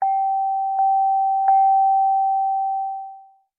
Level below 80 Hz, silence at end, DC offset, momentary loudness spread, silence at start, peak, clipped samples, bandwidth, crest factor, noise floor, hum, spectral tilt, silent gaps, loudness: under -90 dBFS; 0.4 s; under 0.1%; 10 LU; 0 s; -8 dBFS; under 0.1%; 2.3 kHz; 10 dB; -44 dBFS; none; -4.5 dB/octave; none; -19 LUFS